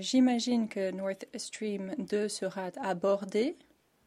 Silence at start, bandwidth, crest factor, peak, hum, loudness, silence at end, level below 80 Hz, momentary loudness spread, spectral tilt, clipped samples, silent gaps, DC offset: 0 s; 13 kHz; 16 dB; -16 dBFS; none; -32 LUFS; 0.55 s; -78 dBFS; 10 LU; -4.5 dB/octave; under 0.1%; none; under 0.1%